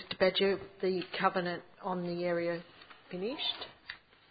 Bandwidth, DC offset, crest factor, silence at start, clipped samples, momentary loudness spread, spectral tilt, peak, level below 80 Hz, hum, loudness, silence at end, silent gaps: 4.9 kHz; under 0.1%; 22 dB; 0 s; under 0.1%; 18 LU; -3 dB/octave; -12 dBFS; -70 dBFS; none; -34 LUFS; 0.35 s; none